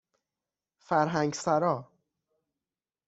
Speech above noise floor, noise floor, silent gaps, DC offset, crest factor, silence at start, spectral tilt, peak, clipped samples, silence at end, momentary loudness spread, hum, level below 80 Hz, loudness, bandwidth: over 63 dB; under -90 dBFS; none; under 0.1%; 20 dB; 0.9 s; -5.5 dB/octave; -12 dBFS; under 0.1%; 1.25 s; 4 LU; none; -72 dBFS; -28 LUFS; 8.2 kHz